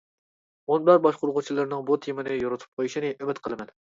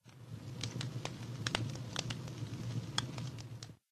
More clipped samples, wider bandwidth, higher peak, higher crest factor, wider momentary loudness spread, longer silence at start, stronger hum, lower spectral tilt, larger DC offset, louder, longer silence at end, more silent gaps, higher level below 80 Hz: neither; second, 7.6 kHz vs 14 kHz; first, -6 dBFS vs -10 dBFS; second, 20 dB vs 32 dB; about the same, 13 LU vs 11 LU; first, 0.7 s vs 0.05 s; neither; first, -6.5 dB/octave vs -4 dB/octave; neither; first, -25 LUFS vs -41 LUFS; first, 0.3 s vs 0.15 s; first, 2.68-2.77 s vs none; about the same, -66 dBFS vs -64 dBFS